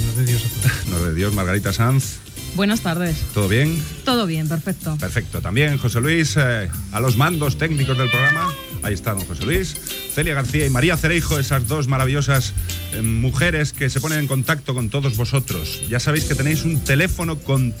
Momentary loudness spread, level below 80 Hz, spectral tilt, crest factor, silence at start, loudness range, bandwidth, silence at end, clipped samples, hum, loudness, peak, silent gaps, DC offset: 7 LU; -34 dBFS; -5 dB/octave; 16 dB; 0 s; 2 LU; 16.5 kHz; 0 s; under 0.1%; none; -20 LUFS; -4 dBFS; none; under 0.1%